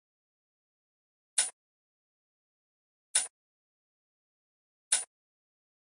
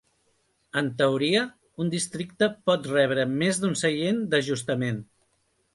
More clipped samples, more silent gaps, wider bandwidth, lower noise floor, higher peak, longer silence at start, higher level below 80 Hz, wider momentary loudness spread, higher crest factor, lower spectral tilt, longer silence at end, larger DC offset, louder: neither; first, 1.53-3.14 s, 3.30-4.91 s vs none; about the same, 12 kHz vs 11.5 kHz; first, under -90 dBFS vs -70 dBFS; second, -12 dBFS vs -8 dBFS; first, 1.35 s vs 0.75 s; second, under -90 dBFS vs -66 dBFS; about the same, 8 LU vs 8 LU; first, 28 dB vs 18 dB; second, 5.5 dB/octave vs -4.5 dB/octave; first, 0.85 s vs 0.7 s; neither; second, -31 LUFS vs -26 LUFS